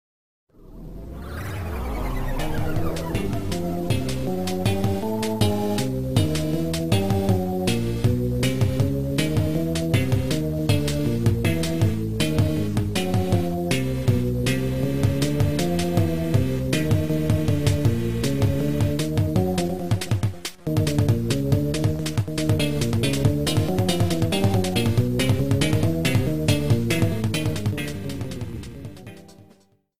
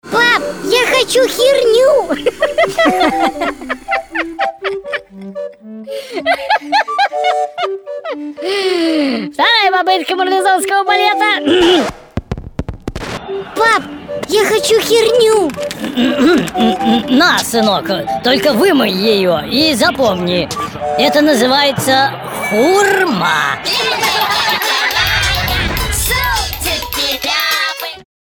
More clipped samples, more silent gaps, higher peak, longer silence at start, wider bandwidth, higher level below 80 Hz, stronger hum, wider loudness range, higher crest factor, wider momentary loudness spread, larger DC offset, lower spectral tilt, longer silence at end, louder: neither; neither; second, -6 dBFS vs 0 dBFS; first, 0.45 s vs 0.05 s; second, 16 kHz vs over 20 kHz; about the same, -36 dBFS vs -34 dBFS; neither; about the same, 4 LU vs 5 LU; about the same, 16 dB vs 12 dB; second, 7 LU vs 13 LU; first, 2% vs under 0.1%; first, -6 dB/octave vs -3.5 dB/octave; second, 0 s vs 0.3 s; second, -23 LUFS vs -13 LUFS